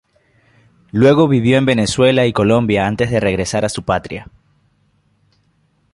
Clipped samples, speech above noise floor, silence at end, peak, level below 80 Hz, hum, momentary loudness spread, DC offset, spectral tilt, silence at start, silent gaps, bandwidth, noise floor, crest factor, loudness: under 0.1%; 46 dB; 1.7 s; -2 dBFS; -42 dBFS; none; 8 LU; under 0.1%; -6 dB/octave; 0.95 s; none; 11.5 kHz; -60 dBFS; 14 dB; -14 LUFS